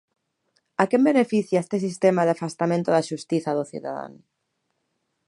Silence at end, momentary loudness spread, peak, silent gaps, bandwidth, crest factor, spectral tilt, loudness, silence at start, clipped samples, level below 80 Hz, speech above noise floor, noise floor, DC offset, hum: 1.15 s; 13 LU; -2 dBFS; none; 11.5 kHz; 22 dB; -6.5 dB/octave; -23 LUFS; 0.8 s; under 0.1%; -74 dBFS; 53 dB; -76 dBFS; under 0.1%; none